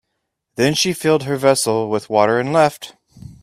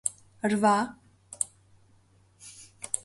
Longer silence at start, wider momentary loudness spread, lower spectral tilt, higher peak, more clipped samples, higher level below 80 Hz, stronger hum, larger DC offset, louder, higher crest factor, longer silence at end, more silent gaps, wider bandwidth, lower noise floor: first, 0.6 s vs 0.05 s; second, 10 LU vs 24 LU; about the same, -4 dB/octave vs -4 dB/octave; first, 0 dBFS vs -8 dBFS; neither; first, -56 dBFS vs -68 dBFS; neither; neither; first, -17 LUFS vs -28 LUFS; about the same, 18 dB vs 22 dB; about the same, 0.1 s vs 0.05 s; neither; first, 16 kHz vs 12 kHz; first, -75 dBFS vs -62 dBFS